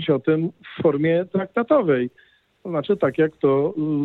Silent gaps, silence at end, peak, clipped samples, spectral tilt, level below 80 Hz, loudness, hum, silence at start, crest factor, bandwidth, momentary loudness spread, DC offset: none; 0 s; -4 dBFS; under 0.1%; -9.5 dB/octave; -66 dBFS; -21 LUFS; none; 0 s; 16 dB; 4.2 kHz; 9 LU; under 0.1%